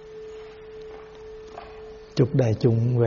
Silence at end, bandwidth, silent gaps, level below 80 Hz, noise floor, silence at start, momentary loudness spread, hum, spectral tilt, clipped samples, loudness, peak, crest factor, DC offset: 0 s; 7 kHz; none; -52 dBFS; -42 dBFS; 0 s; 20 LU; none; -8.5 dB/octave; under 0.1%; -23 LUFS; -8 dBFS; 18 dB; under 0.1%